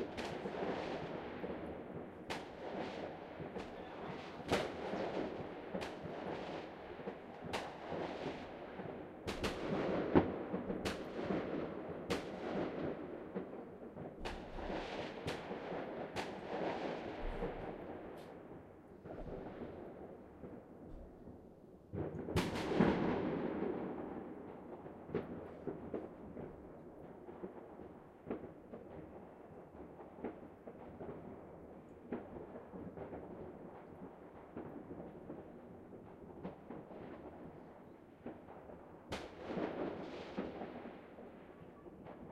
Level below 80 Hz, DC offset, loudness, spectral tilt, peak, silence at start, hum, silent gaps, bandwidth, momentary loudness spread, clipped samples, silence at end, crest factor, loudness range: -60 dBFS; under 0.1%; -44 LUFS; -6.5 dB/octave; -16 dBFS; 0 s; none; none; 15 kHz; 15 LU; under 0.1%; 0 s; 28 dB; 13 LU